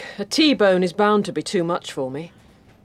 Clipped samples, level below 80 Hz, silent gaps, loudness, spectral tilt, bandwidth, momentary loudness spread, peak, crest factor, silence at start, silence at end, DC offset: under 0.1%; -62 dBFS; none; -20 LUFS; -4.5 dB/octave; 14.5 kHz; 13 LU; -4 dBFS; 16 dB; 0 s; 0.55 s; under 0.1%